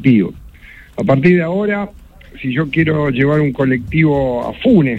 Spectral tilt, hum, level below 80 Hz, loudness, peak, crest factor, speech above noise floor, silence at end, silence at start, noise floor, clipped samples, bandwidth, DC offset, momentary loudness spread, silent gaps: -9 dB/octave; none; -38 dBFS; -15 LUFS; 0 dBFS; 14 dB; 25 dB; 0 s; 0 s; -39 dBFS; under 0.1%; 7.8 kHz; under 0.1%; 9 LU; none